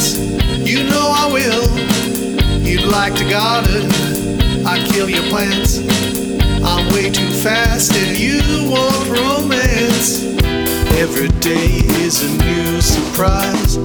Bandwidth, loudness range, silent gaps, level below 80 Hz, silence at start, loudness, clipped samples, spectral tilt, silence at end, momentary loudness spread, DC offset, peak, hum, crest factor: over 20 kHz; 1 LU; none; -22 dBFS; 0 s; -14 LUFS; under 0.1%; -4 dB/octave; 0 s; 3 LU; under 0.1%; 0 dBFS; none; 14 dB